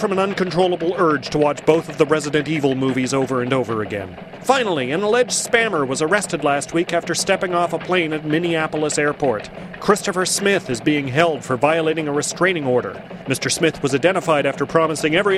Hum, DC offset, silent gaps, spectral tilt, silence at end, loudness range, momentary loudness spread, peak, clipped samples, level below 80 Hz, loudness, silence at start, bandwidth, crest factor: none; under 0.1%; none; -4 dB/octave; 0 s; 1 LU; 5 LU; 0 dBFS; under 0.1%; -52 dBFS; -19 LUFS; 0 s; 15 kHz; 18 dB